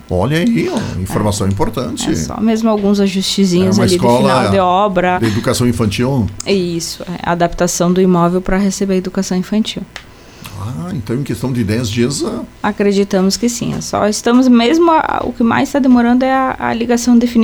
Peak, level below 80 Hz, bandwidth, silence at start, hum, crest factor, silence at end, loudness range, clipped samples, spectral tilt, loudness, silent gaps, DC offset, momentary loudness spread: -2 dBFS; -36 dBFS; 19 kHz; 0.1 s; none; 12 dB; 0 s; 6 LU; under 0.1%; -5.5 dB/octave; -14 LUFS; none; under 0.1%; 9 LU